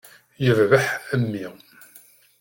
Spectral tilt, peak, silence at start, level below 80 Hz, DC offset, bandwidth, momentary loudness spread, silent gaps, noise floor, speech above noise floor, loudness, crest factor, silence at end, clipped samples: -6 dB/octave; -4 dBFS; 0.4 s; -60 dBFS; under 0.1%; 17 kHz; 14 LU; none; -52 dBFS; 31 dB; -21 LUFS; 20 dB; 0.9 s; under 0.1%